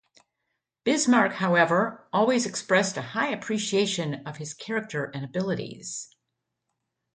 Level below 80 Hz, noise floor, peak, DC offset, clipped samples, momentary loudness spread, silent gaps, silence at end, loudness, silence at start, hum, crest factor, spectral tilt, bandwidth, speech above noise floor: -70 dBFS; -82 dBFS; -6 dBFS; under 0.1%; under 0.1%; 14 LU; none; 1.1 s; -26 LUFS; 0.85 s; none; 20 dB; -4 dB/octave; 9.6 kHz; 56 dB